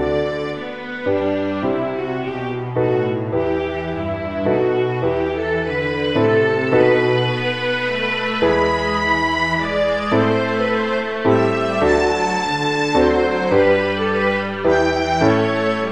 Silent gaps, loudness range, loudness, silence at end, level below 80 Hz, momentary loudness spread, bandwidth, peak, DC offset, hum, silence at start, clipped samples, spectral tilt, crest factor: none; 4 LU; -18 LUFS; 0 s; -42 dBFS; 7 LU; 10.5 kHz; -2 dBFS; 0.6%; none; 0 s; under 0.1%; -6 dB/octave; 16 dB